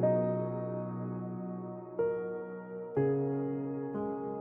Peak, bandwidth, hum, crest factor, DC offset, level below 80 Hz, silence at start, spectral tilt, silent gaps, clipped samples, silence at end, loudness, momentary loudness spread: -18 dBFS; 3.3 kHz; none; 16 dB; under 0.1%; -70 dBFS; 0 s; -12.5 dB/octave; none; under 0.1%; 0 s; -35 LUFS; 10 LU